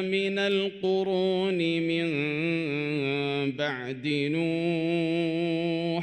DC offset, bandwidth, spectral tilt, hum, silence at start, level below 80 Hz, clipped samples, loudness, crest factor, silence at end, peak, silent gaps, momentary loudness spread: under 0.1%; 9.2 kHz; -6.5 dB/octave; none; 0 s; -70 dBFS; under 0.1%; -27 LUFS; 14 dB; 0 s; -14 dBFS; none; 3 LU